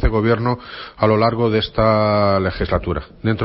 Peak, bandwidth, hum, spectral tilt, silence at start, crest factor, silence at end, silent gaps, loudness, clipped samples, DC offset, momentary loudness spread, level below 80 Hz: 0 dBFS; 5.8 kHz; none; -11.5 dB/octave; 0 s; 16 dB; 0 s; none; -18 LUFS; under 0.1%; under 0.1%; 8 LU; -30 dBFS